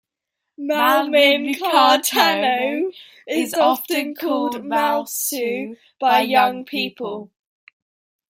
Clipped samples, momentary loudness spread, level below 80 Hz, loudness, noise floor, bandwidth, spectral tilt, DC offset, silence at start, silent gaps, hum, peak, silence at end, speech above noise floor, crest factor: under 0.1%; 12 LU; -74 dBFS; -18 LUFS; -81 dBFS; 16.5 kHz; -2 dB/octave; under 0.1%; 0.6 s; none; none; -2 dBFS; 1.05 s; 62 dB; 18 dB